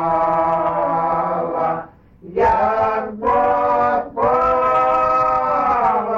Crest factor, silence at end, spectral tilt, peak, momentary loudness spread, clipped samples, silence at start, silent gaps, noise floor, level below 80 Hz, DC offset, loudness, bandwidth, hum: 12 dB; 0 s; -7.5 dB/octave; -6 dBFS; 5 LU; under 0.1%; 0 s; none; -40 dBFS; -44 dBFS; under 0.1%; -17 LUFS; 7.4 kHz; none